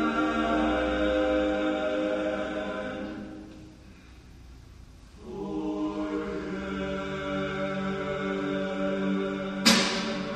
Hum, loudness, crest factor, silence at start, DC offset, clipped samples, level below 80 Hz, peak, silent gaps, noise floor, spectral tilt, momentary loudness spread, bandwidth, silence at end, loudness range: none; -28 LUFS; 22 dB; 0 s; under 0.1%; under 0.1%; -48 dBFS; -6 dBFS; none; -49 dBFS; -4 dB/octave; 14 LU; 13.5 kHz; 0 s; 10 LU